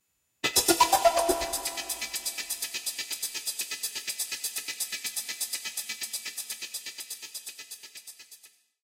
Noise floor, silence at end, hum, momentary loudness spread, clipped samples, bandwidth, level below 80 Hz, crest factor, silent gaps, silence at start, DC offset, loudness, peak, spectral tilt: -56 dBFS; 0.35 s; none; 18 LU; under 0.1%; 17 kHz; -60 dBFS; 22 dB; none; 0.45 s; under 0.1%; -29 LUFS; -8 dBFS; -0.5 dB/octave